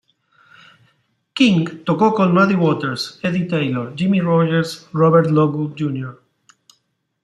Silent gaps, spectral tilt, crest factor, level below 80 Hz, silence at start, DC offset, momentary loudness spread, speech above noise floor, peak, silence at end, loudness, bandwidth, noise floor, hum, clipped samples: none; -7 dB/octave; 16 dB; -60 dBFS; 1.35 s; under 0.1%; 10 LU; 50 dB; -2 dBFS; 1.1 s; -17 LUFS; 12 kHz; -67 dBFS; none; under 0.1%